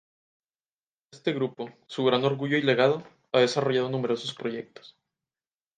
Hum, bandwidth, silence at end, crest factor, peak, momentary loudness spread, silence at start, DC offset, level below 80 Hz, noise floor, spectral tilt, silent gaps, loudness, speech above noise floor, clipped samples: none; 9.4 kHz; 0.9 s; 20 dB; -8 dBFS; 12 LU; 1.15 s; under 0.1%; -78 dBFS; under -90 dBFS; -5.5 dB/octave; none; -26 LUFS; over 64 dB; under 0.1%